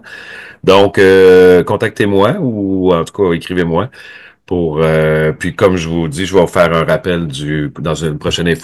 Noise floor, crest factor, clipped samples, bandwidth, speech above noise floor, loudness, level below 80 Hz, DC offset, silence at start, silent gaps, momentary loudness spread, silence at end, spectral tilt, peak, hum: -32 dBFS; 12 dB; under 0.1%; 12.5 kHz; 20 dB; -12 LUFS; -40 dBFS; under 0.1%; 0.05 s; none; 11 LU; 0 s; -6 dB/octave; 0 dBFS; none